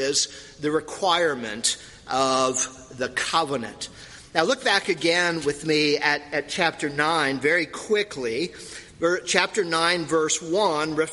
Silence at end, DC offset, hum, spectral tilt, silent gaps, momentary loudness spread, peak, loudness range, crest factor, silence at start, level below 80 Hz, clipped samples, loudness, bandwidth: 0 s; under 0.1%; none; -2.5 dB/octave; none; 8 LU; 0 dBFS; 2 LU; 24 dB; 0 s; -58 dBFS; under 0.1%; -23 LUFS; 11.5 kHz